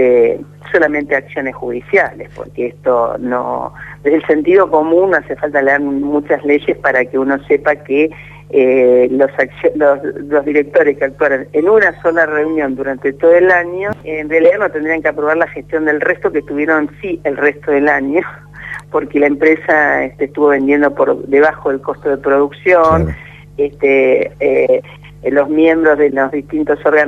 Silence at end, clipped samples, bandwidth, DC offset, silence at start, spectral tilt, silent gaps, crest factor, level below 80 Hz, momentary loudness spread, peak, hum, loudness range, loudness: 0 s; under 0.1%; 6.8 kHz; under 0.1%; 0 s; -8 dB/octave; none; 12 dB; -42 dBFS; 9 LU; 0 dBFS; 50 Hz at -40 dBFS; 3 LU; -13 LUFS